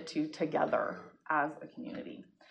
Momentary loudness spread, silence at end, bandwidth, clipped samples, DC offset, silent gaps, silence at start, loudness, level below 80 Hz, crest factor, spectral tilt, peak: 16 LU; 0.3 s; 9.4 kHz; under 0.1%; under 0.1%; none; 0 s; -35 LUFS; -78 dBFS; 18 dB; -6 dB/octave; -18 dBFS